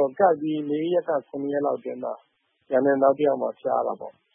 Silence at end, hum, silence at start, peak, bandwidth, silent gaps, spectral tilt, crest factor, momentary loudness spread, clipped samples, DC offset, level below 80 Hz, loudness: 0.25 s; none; 0 s; -6 dBFS; 3.6 kHz; none; -10.5 dB/octave; 18 dB; 12 LU; under 0.1%; under 0.1%; -80 dBFS; -24 LUFS